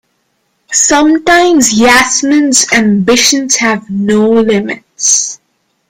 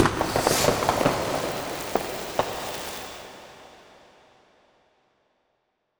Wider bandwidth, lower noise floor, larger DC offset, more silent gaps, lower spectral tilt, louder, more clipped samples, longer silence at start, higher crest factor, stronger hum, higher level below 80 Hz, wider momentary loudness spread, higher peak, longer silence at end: about the same, over 20 kHz vs over 20 kHz; second, -61 dBFS vs -74 dBFS; neither; neither; about the same, -2.5 dB/octave vs -3.5 dB/octave; first, -8 LUFS vs -26 LUFS; first, 0.2% vs under 0.1%; first, 0.7 s vs 0 s; second, 10 dB vs 24 dB; neither; first, -42 dBFS vs -48 dBFS; second, 7 LU vs 20 LU; first, 0 dBFS vs -6 dBFS; second, 0.55 s vs 2.15 s